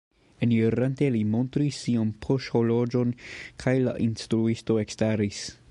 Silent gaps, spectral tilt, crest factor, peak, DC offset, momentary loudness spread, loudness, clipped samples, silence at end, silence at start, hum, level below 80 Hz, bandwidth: none; -7 dB/octave; 16 dB; -10 dBFS; under 0.1%; 6 LU; -26 LUFS; under 0.1%; 0.2 s; 0.4 s; none; -54 dBFS; 11 kHz